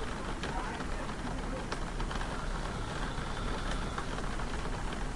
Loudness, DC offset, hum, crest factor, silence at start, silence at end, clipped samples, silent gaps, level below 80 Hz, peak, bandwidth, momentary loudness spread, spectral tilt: -38 LUFS; under 0.1%; none; 16 dB; 0 s; 0 s; under 0.1%; none; -38 dBFS; -20 dBFS; 11.5 kHz; 2 LU; -5 dB/octave